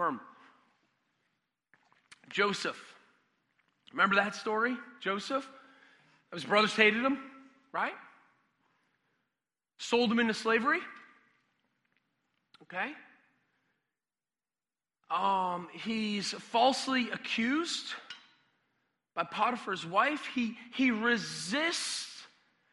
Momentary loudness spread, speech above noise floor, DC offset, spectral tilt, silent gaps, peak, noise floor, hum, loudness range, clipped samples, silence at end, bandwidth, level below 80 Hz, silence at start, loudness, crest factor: 16 LU; over 59 dB; under 0.1%; -3.5 dB/octave; none; -8 dBFS; under -90 dBFS; none; 8 LU; under 0.1%; 0.45 s; 11.5 kHz; -80 dBFS; 0 s; -31 LUFS; 26 dB